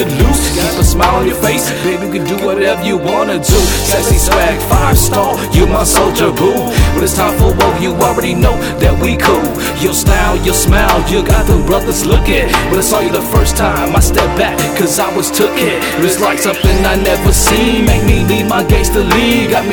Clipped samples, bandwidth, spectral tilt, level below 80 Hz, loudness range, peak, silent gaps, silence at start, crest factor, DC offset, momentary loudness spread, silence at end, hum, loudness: under 0.1%; over 20 kHz; -4.5 dB/octave; -16 dBFS; 1 LU; 0 dBFS; none; 0 s; 10 dB; under 0.1%; 3 LU; 0 s; none; -11 LUFS